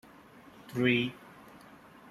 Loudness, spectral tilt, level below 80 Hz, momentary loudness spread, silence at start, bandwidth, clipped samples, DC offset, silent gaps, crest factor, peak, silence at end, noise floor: -30 LUFS; -6.5 dB/octave; -70 dBFS; 26 LU; 0.65 s; 14 kHz; under 0.1%; under 0.1%; none; 22 dB; -12 dBFS; 0.5 s; -55 dBFS